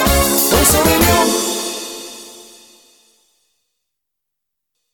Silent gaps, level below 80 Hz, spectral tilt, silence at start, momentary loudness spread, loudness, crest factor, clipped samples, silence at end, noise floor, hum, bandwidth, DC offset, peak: none; -30 dBFS; -3 dB/octave; 0 s; 21 LU; -13 LUFS; 18 dB; under 0.1%; 2.5 s; -79 dBFS; none; 19.5 kHz; under 0.1%; 0 dBFS